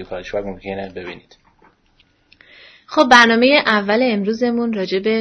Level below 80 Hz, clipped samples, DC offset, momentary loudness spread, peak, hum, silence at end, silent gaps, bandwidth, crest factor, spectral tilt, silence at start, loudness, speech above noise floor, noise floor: -50 dBFS; under 0.1%; under 0.1%; 18 LU; 0 dBFS; none; 0 s; none; 11 kHz; 18 dB; -4 dB/octave; 0 s; -15 LUFS; 41 dB; -58 dBFS